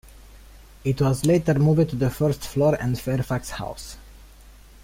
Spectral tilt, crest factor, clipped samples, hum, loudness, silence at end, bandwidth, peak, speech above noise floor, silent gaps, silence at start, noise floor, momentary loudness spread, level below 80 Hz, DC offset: -7 dB/octave; 18 dB; under 0.1%; none; -23 LUFS; 0.35 s; 16.5 kHz; -6 dBFS; 25 dB; none; 0.35 s; -47 dBFS; 14 LU; -44 dBFS; under 0.1%